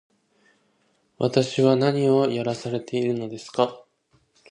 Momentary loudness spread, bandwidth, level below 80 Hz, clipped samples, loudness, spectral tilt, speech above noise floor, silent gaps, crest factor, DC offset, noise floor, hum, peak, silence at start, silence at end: 9 LU; 10.5 kHz; -68 dBFS; under 0.1%; -23 LUFS; -6.5 dB/octave; 45 dB; none; 20 dB; under 0.1%; -67 dBFS; none; -4 dBFS; 1.2 s; 0.7 s